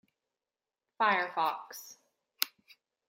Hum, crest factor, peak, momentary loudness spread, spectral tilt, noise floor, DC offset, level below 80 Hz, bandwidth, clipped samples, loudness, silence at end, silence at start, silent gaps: none; 34 dB; -2 dBFS; 18 LU; -1.5 dB/octave; under -90 dBFS; under 0.1%; under -90 dBFS; 16 kHz; under 0.1%; -32 LUFS; 0.6 s; 1 s; none